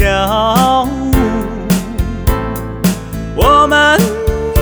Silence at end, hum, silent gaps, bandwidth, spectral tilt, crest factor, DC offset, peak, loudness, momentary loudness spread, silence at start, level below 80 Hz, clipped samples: 0 s; none; none; over 20 kHz; -5 dB/octave; 12 dB; under 0.1%; 0 dBFS; -13 LUFS; 11 LU; 0 s; -22 dBFS; under 0.1%